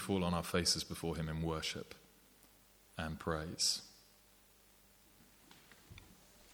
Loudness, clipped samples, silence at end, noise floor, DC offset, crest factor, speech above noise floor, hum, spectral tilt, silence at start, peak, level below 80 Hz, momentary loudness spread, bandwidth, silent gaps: -37 LUFS; under 0.1%; 0 s; -66 dBFS; under 0.1%; 24 dB; 28 dB; none; -3.5 dB/octave; 0 s; -18 dBFS; -58 dBFS; 24 LU; over 20 kHz; none